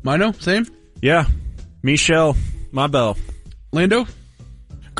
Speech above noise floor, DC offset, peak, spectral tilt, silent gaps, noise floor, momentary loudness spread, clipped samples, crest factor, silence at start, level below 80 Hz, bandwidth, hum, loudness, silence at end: 24 dB; under 0.1%; -4 dBFS; -5 dB/octave; none; -41 dBFS; 16 LU; under 0.1%; 16 dB; 0.05 s; -28 dBFS; 11.5 kHz; none; -18 LUFS; 0 s